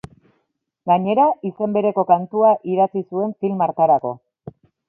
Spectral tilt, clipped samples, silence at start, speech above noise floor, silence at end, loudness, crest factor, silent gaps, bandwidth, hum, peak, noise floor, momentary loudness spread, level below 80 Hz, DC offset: -9.5 dB/octave; under 0.1%; 0.85 s; 54 dB; 0.4 s; -18 LUFS; 18 dB; none; 3.4 kHz; none; -2 dBFS; -72 dBFS; 8 LU; -62 dBFS; under 0.1%